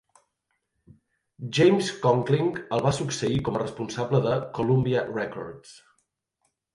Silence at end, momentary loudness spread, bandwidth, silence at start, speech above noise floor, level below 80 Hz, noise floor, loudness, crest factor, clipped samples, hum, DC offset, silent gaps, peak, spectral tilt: 1 s; 12 LU; 11.5 kHz; 1.4 s; 53 dB; -56 dBFS; -78 dBFS; -25 LUFS; 18 dB; under 0.1%; none; under 0.1%; none; -8 dBFS; -6 dB/octave